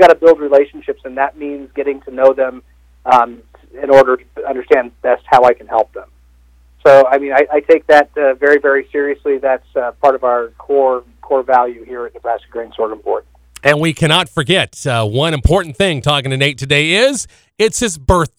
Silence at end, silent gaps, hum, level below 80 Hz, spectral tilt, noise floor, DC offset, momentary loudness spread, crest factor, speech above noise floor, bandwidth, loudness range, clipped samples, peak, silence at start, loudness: 0.1 s; none; 60 Hz at -50 dBFS; -32 dBFS; -4.5 dB/octave; -47 dBFS; under 0.1%; 13 LU; 14 dB; 34 dB; 15.5 kHz; 4 LU; 0.5%; 0 dBFS; 0 s; -13 LUFS